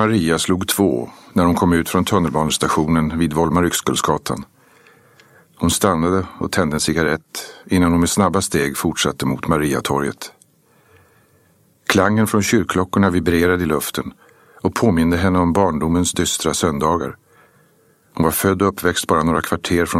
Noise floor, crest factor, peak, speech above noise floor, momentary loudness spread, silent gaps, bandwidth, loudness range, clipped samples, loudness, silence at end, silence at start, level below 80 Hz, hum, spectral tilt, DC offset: -56 dBFS; 18 dB; 0 dBFS; 39 dB; 7 LU; none; 16.5 kHz; 3 LU; under 0.1%; -18 LUFS; 0 s; 0 s; -40 dBFS; none; -4.5 dB/octave; under 0.1%